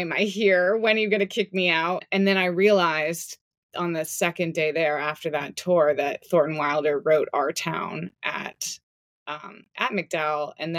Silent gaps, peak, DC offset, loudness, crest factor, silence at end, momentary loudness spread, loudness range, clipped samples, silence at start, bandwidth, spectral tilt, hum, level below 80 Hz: 3.41-3.51 s, 3.57-3.69 s, 8.83-9.26 s; -8 dBFS; under 0.1%; -24 LUFS; 18 dB; 0 s; 13 LU; 6 LU; under 0.1%; 0 s; 16.5 kHz; -4 dB/octave; none; -74 dBFS